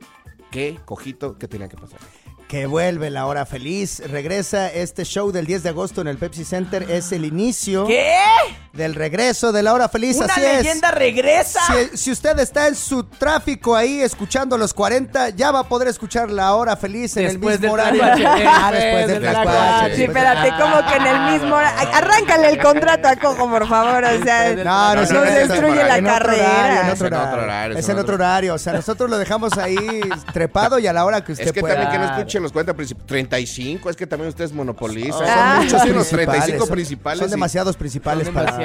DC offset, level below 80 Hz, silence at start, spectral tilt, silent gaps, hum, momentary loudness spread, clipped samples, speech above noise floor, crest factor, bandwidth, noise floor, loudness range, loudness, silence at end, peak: under 0.1%; -40 dBFS; 0.25 s; -4 dB/octave; none; none; 12 LU; under 0.1%; 28 dB; 16 dB; 16 kHz; -45 dBFS; 9 LU; -17 LUFS; 0 s; -2 dBFS